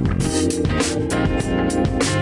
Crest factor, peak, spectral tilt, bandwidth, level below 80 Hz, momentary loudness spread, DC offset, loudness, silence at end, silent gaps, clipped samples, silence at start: 12 dB; -8 dBFS; -5 dB/octave; 11.5 kHz; -32 dBFS; 1 LU; under 0.1%; -20 LUFS; 0 s; none; under 0.1%; 0 s